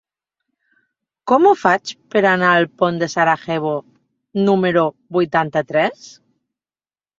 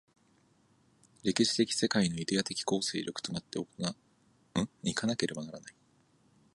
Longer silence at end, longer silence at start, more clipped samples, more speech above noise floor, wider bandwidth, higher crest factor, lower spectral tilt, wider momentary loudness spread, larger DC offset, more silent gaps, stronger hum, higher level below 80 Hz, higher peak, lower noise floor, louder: first, 1.1 s vs 0.85 s; about the same, 1.25 s vs 1.25 s; neither; first, over 74 dB vs 35 dB; second, 7.6 kHz vs 11.5 kHz; second, 18 dB vs 24 dB; first, -6 dB/octave vs -4 dB/octave; second, 8 LU vs 13 LU; neither; neither; neither; about the same, -62 dBFS vs -66 dBFS; first, 0 dBFS vs -10 dBFS; first, under -90 dBFS vs -68 dBFS; first, -17 LUFS vs -32 LUFS